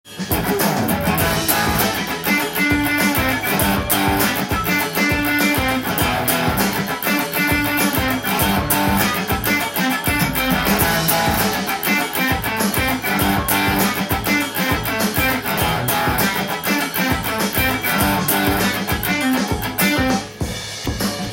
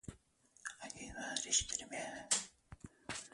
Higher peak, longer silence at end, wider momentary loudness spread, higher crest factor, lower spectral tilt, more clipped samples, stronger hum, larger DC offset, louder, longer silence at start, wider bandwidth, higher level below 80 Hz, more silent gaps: first, -2 dBFS vs -16 dBFS; about the same, 0 s vs 0 s; second, 3 LU vs 20 LU; second, 18 dB vs 28 dB; first, -3.5 dB/octave vs -0.5 dB/octave; neither; neither; neither; first, -18 LUFS vs -39 LUFS; about the same, 0.05 s vs 0.05 s; first, 17 kHz vs 11.5 kHz; first, -36 dBFS vs -64 dBFS; neither